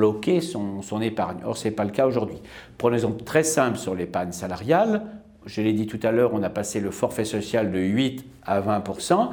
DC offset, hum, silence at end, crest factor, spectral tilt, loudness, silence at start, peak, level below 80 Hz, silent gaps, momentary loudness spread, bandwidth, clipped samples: under 0.1%; none; 0 s; 20 dB; -5.5 dB/octave; -24 LUFS; 0 s; -4 dBFS; -56 dBFS; none; 9 LU; over 20 kHz; under 0.1%